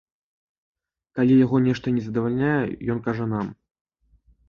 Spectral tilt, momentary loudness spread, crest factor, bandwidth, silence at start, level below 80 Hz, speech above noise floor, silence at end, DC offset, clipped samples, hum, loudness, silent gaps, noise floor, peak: -9 dB/octave; 11 LU; 16 dB; 6.8 kHz; 1.15 s; -54 dBFS; 39 dB; 0.95 s; under 0.1%; under 0.1%; none; -22 LUFS; none; -60 dBFS; -8 dBFS